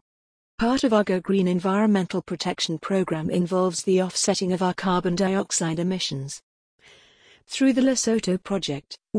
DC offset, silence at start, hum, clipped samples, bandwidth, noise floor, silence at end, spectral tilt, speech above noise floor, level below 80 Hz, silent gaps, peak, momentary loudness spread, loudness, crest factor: under 0.1%; 0.6 s; none; under 0.1%; 10.5 kHz; -56 dBFS; 0 s; -4.5 dB/octave; 33 dB; -54 dBFS; 6.43-6.79 s; -6 dBFS; 7 LU; -23 LUFS; 18 dB